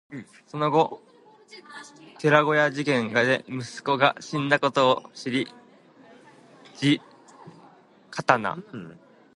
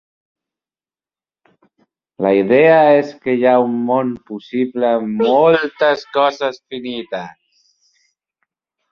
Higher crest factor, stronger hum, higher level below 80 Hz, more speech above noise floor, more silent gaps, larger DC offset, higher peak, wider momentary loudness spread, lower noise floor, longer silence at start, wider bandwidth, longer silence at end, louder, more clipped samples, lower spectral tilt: first, 24 dB vs 16 dB; neither; second, -74 dBFS vs -62 dBFS; second, 30 dB vs over 75 dB; neither; neither; about the same, -2 dBFS vs -2 dBFS; first, 22 LU vs 15 LU; second, -54 dBFS vs under -90 dBFS; second, 0.1 s vs 2.2 s; first, 11.5 kHz vs 6.8 kHz; second, 0.45 s vs 1.6 s; second, -24 LUFS vs -15 LUFS; neither; second, -5 dB/octave vs -6.5 dB/octave